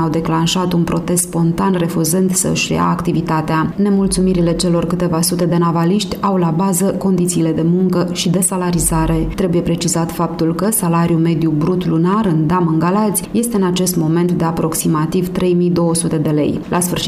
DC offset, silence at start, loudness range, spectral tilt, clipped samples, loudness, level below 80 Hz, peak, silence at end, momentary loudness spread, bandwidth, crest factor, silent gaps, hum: under 0.1%; 0 s; 1 LU; -5.5 dB/octave; under 0.1%; -15 LUFS; -36 dBFS; -4 dBFS; 0 s; 3 LU; 15.5 kHz; 10 dB; none; none